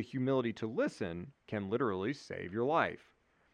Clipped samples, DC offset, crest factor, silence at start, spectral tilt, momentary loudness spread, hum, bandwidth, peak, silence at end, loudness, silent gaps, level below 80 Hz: under 0.1%; under 0.1%; 20 dB; 0 s; -7 dB/octave; 10 LU; none; 10 kHz; -16 dBFS; 0.55 s; -36 LUFS; none; -74 dBFS